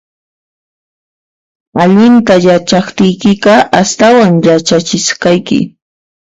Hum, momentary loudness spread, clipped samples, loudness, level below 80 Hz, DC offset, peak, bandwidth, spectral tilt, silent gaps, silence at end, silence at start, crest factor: none; 7 LU; 0.3%; -8 LUFS; -48 dBFS; under 0.1%; 0 dBFS; 8 kHz; -5 dB/octave; none; 0.7 s; 1.75 s; 10 dB